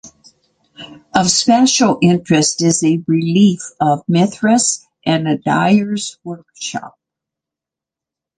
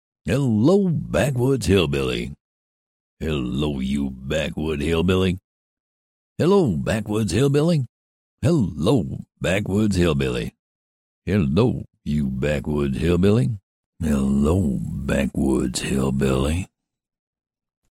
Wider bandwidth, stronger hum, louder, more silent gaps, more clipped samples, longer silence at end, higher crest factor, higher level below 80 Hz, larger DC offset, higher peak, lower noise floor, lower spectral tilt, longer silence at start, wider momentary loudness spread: second, 10 kHz vs 16 kHz; neither; first, -14 LUFS vs -22 LUFS; second, none vs 2.40-3.17 s, 5.44-6.36 s, 7.89-8.38 s, 10.59-11.22 s, 13.63-13.93 s; neither; first, 1.5 s vs 1.25 s; about the same, 16 dB vs 16 dB; second, -56 dBFS vs -36 dBFS; neither; first, 0 dBFS vs -6 dBFS; second, -86 dBFS vs under -90 dBFS; second, -4.5 dB/octave vs -6.5 dB/octave; second, 0.05 s vs 0.25 s; first, 13 LU vs 9 LU